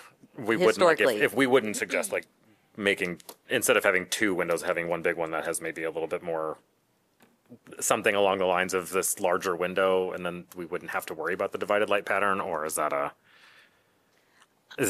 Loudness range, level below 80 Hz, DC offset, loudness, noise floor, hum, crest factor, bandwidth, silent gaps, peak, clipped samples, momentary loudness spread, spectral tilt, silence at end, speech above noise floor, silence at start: 5 LU; -70 dBFS; under 0.1%; -27 LUFS; -70 dBFS; none; 24 dB; 15 kHz; none; -4 dBFS; under 0.1%; 12 LU; -3 dB/octave; 0 s; 43 dB; 0 s